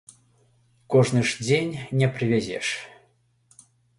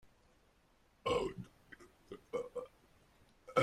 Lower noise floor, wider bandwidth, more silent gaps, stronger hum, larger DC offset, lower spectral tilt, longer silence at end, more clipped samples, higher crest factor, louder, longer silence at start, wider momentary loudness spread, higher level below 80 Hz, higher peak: second, -64 dBFS vs -71 dBFS; second, 11.5 kHz vs 14.5 kHz; neither; neither; neither; about the same, -5.5 dB/octave vs -5 dB/octave; first, 1.1 s vs 0 s; neither; second, 18 dB vs 24 dB; first, -24 LUFS vs -41 LUFS; second, 0.9 s vs 1.05 s; second, 8 LU vs 22 LU; first, -60 dBFS vs -66 dBFS; first, -6 dBFS vs -18 dBFS